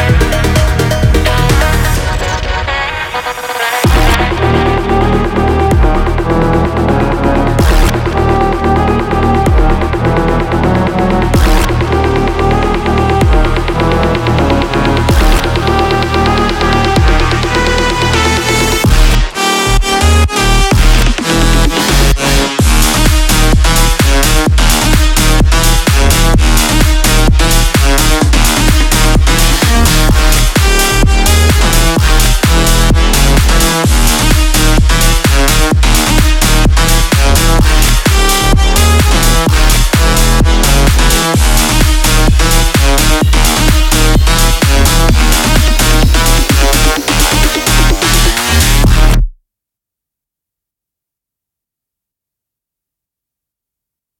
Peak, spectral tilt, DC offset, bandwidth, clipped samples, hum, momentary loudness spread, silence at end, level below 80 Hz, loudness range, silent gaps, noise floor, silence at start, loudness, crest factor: 0 dBFS; -4 dB/octave; under 0.1%; 17.5 kHz; under 0.1%; none; 3 LU; 4.85 s; -12 dBFS; 2 LU; none; -82 dBFS; 0 s; -10 LUFS; 8 dB